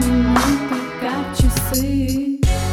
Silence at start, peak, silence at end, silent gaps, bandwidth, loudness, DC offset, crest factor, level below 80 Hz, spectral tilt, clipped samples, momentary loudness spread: 0 s; -4 dBFS; 0 s; none; 19 kHz; -19 LUFS; under 0.1%; 14 dB; -24 dBFS; -5 dB/octave; under 0.1%; 8 LU